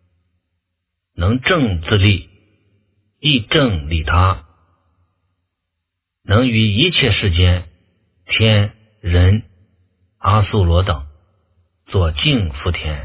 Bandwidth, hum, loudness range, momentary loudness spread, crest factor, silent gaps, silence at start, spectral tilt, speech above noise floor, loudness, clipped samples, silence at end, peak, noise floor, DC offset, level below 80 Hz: 4 kHz; none; 3 LU; 8 LU; 18 dB; none; 1.15 s; -10 dB/octave; 63 dB; -16 LUFS; under 0.1%; 0 s; 0 dBFS; -77 dBFS; under 0.1%; -26 dBFS